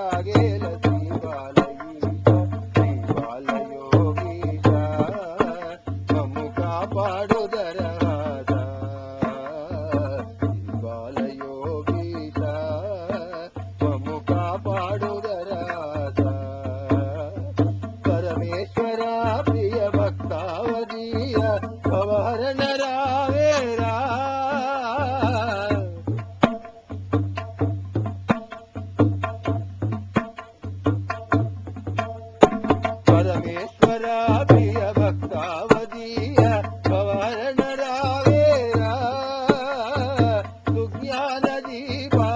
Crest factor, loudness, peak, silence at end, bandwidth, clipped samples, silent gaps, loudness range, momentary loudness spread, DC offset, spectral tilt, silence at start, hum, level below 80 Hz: 22 dB; -23 LUFS; 0 dBFS; 0 s; 7.8 kHz; under 0.1%; none; 6 LU; 10 LU; under 0.1%; -7.5 dB/octave; 0 s; none; -42 dBFS